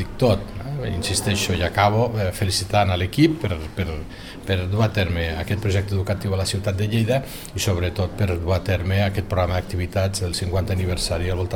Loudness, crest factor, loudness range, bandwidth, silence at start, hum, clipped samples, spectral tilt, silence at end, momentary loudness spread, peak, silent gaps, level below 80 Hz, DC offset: -22 LUFS; 20 dB; 2 LU; 17.5 kHz; 0 s; none; under 0.1%; -5.5 dB/octave; 0 s; 8 LU; -2 dBFS; none; -36 dBFS; 0.4%